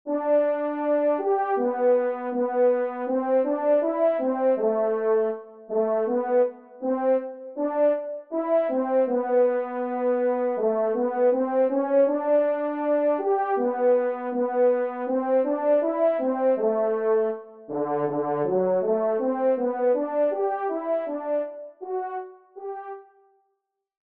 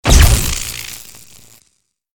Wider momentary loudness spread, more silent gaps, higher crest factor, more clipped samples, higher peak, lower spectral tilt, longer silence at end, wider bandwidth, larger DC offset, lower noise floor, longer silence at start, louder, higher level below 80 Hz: second, 8 LU vs 22 LU; neither; about the same, 12 dB vs 16 dB; neither; second, -12 dBFS vs 0 dBFS; first, -6.5 dB/octave vs -3.5 dB/octave; about the same, 1.1 s vs 1.2 s; second, 3.6 kHz vs 19 kHz; neither; first, -77 dBFS vs -63 dBFS; about the same, 0.05 s vs 0.05 s; second, -24 LUFS vs -14 LUFS; second, -80 dBFS vs -16 dBFS